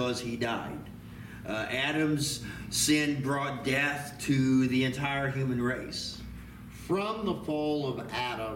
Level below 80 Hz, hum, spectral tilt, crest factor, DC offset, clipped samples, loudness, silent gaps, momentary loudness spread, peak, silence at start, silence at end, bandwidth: -54 dBFS; none; -4.5 dB/octave; 16 dB; under 0.1%; under 0.1%; -30 LUFS; none; 17 LU; -14 dBFS; 0 s; 0 s; 17 kHz